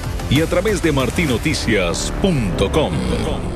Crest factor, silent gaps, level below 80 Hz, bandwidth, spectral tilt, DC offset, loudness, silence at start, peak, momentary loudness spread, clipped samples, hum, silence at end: 16 dB; none; -26 dBFS; 14.5 kHz; -5 dB/octave; under 0.1%; -18 LUFS; 0 s; -2 dBFS; 3 LU; under 0.1%; none; 0 s